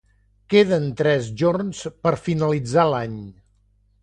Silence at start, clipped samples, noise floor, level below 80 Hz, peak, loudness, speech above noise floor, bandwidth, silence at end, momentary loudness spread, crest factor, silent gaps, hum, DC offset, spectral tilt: 0.5 s; under 0.1%; -61 dBFS; -52 dBFS; -4 dBFS; -21 LUFS; 40 dB; 9.8 kHz; 0.7 s; 9 LU; 18 dB; none; 50 Hz at -50 dBFS; under 0.1%; -6.5 dB/octave